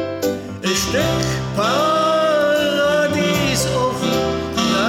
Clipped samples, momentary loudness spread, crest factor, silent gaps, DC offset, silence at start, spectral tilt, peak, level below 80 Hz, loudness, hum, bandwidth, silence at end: under 0.1%; 5 LU; 12 dB; none; under 0.1%; 0 s; -4 dB/octave; -4 dBFS; -40 dBFS; -18 LUFS; none; 17.5 kHz; 0 s